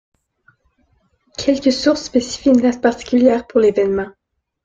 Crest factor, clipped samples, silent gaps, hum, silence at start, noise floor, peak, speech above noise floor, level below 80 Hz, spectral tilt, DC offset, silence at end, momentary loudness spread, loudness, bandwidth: 16 dB; under 0.1%; none; none; 1.4 s; -61 dBFS; -2 dBFS; 46 dB; -50 dBFS; -4.5 dB/octave; under 0.1%; 0.55 s; 8 LU; -16 LUFS; 7.8 kHz